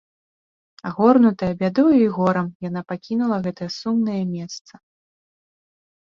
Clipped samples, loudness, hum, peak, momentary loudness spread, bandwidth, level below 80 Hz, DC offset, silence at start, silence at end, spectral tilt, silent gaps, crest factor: under 0.1%; -20 LUFS; none; -4 dBFS; 15 LU; 7.2 kHz; -58 dBFS; under 0.1%; 0.85 s; 1.55 s; -7.5 dB/octave; 2.55-2.60 s; 18 dB